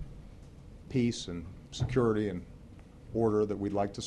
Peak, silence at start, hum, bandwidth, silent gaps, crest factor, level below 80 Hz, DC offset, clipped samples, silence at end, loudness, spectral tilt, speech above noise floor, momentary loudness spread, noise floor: -14 dBFS; 0 s; none; 11 kHz; none; 18 dB; -52 dBFS; under 0.1%; under 0.1%; 0 s; -32 LUFS; -6.5 dB/octave; 20 dB; 24 LU; -51 dBFS